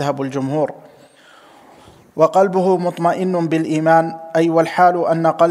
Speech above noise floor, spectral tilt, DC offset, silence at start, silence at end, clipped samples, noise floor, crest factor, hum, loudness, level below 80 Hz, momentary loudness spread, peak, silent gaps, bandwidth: 31 dB; -7 dB/octave; under 0.1%; 0 s; 0 s; under 0.1%; -46 dBFS; 16 dB; none; -16 LUFS; -66 dBFS; 7 LU; -2 dBFS; none; 13 kHz